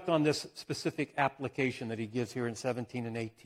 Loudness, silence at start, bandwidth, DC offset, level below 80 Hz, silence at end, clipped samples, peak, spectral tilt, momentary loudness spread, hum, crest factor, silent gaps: -34 LUFS; 0 s; 15.5 kHz; under 0.1%; -70 dBFS; 0.15 s; under 0.1%; -14 dBFS; -5.5 dB/octave; 8 LU; none; 20 dB; none